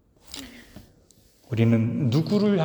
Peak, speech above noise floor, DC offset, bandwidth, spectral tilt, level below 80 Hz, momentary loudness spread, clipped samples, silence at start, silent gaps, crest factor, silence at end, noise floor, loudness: -8 dBFS; 36 dB; under 0.1%; over 20 kHz; -7.5 dB/octave; -58 dBFS; 18 LU; under 0.1%; 0.3 s; none; 18 dB; 0 s; -58 dBFS; -23 LUFS